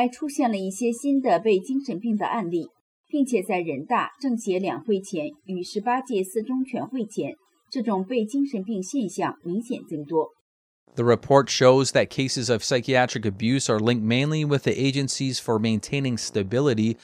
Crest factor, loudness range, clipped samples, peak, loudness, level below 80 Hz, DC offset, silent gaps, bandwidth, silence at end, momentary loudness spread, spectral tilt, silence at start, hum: 20 dB; 7 LU; under 0.1%; -4 dBFS; -24 LUFS; -66 dBFS; under 0.1%; 2.81-3.04 s, 10.41-10.86 s; 14.5 kHz; 0.1 s; 9 LU; -5 dB/octave; 0 s; none